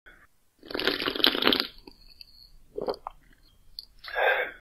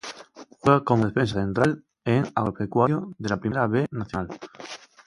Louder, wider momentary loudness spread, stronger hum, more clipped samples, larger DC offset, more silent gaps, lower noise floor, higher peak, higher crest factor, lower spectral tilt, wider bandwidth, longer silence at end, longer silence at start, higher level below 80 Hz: about the same, -26 LUFS vs -24 LUFS; first, 22 LU vs 18 LU; neither; neither; neither; neither; first, -60 dBFS vs -47 dBFS; about the same, 0 dBFS vs -2 dBFS; first, 30 dB vs 22 dB; second, -3 dB/octave vs -7 dB/octave; first, 16 kHz vs 11.5 kHz; second, 0 s vs 0.3 s; about the same, 0.05 s vs 0.05 s; about the same, -56 dBFS vs -52 dBFS